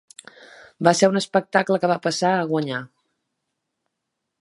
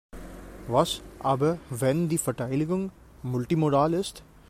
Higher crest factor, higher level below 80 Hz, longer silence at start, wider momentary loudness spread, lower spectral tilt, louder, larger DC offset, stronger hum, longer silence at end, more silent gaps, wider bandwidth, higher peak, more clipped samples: about the same, 22 dB vs 20 dB; second, -74 dBFS vs -50 dBFS; first, 0.8 s vs 0.15 s; second, 7 LU vs 16 LU; second, -4.5 dB/octave vs -6 dB/octave; first, -21 LUFS vs -27 LUFS; neither; neither; first, 1.55 s vs 0.25 s; neither; second, 11.5 kHz vs 16 kHz; first, 0 dBFS vs -8 dBFS; neither